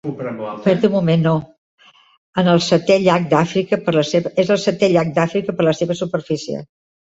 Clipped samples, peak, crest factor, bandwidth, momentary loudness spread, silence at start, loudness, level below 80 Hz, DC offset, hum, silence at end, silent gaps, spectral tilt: under 0.1%; 0 dBFS; 16 dB; 8 kHz; 9 LU; 0.05 s; -17 LUFS; -56 dBFS; under 0.1%; none; 0.5 s; 1.58-1.78 s, 2.18-2.33 s; -6 dB/octave